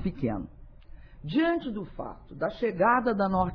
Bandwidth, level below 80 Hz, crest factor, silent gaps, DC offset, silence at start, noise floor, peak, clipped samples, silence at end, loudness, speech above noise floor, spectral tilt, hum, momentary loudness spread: 5.4 kHz; -48 dBFS; 18 dB; none; under 0.1%; 0 s; -47 dBFS; -12 dBFS; under 0.1%; 0 s; -28 LUFS; 19 dB; -9.5 dB/octave; none; 17 LU